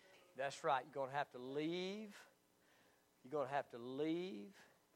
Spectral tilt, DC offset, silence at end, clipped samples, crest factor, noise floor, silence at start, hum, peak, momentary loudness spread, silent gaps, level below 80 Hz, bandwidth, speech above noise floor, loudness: -5 dB/octave; under 0.1%; 0.3 s; under 0.1%; 20 dB; -74 dBFS; 0.05 s; none; -26 dBFS; 15 LU; none; under -90 dBFS; 16.5 kHz; 30 dB; -45 LUFS